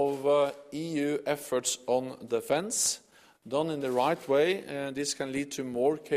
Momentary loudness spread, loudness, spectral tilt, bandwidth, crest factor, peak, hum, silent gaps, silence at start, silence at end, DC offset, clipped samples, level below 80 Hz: 8 LU; -30 LUFS; -3.5 dB/octave; 15.5 kHz; 16 dB; -14 dBFS; none; none; 0 s; 0 s; under 0.1%; under 0.1%; -72 dBFS